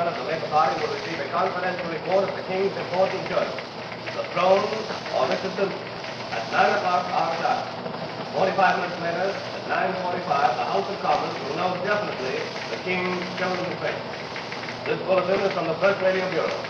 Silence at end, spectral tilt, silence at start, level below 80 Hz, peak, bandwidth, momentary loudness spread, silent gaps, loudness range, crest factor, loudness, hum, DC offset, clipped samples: 0 s; -5 dB/octave; 0 s; -64 dBFS; -6 dBFS; 7.8 kHz; 10 LU; none; 2 LU; 20 dB; -25 LUFS; none; under 0.1%; under 0.1%